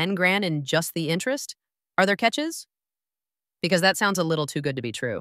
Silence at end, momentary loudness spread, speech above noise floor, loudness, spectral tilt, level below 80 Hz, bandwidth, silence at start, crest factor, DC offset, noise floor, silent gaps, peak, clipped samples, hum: 0 s; 10 LU; over 66 dB; -24 LUFS; -4 dB/octave; -70 dBFS; 16 kHz; 0 s; 20 dB; under 0.1%; under -90 dBFS; none; -6 dBFS; under 0.1%; none